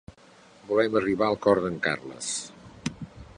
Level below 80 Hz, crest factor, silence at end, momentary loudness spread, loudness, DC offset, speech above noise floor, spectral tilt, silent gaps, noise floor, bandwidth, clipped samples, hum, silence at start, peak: -56 dBFS; 22 dB; 0.1 s; 13 LU; -27 LUFS; under 0.1%; 29 dB; -4 dB/octave; none; -54 dBFS; 11 kHz; under 0.1%; none; 0.65 s; -6 dBFS